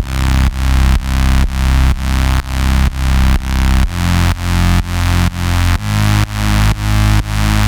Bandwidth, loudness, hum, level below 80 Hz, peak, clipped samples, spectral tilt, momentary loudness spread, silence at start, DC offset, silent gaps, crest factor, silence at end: 19 kHz; -14 LUFS; none; -14 dBFS; 0 dBFS; under 0.1%; -5 dB/octave; 2 LU; 0 s; under 0.1%; none; 12 dB; 0 s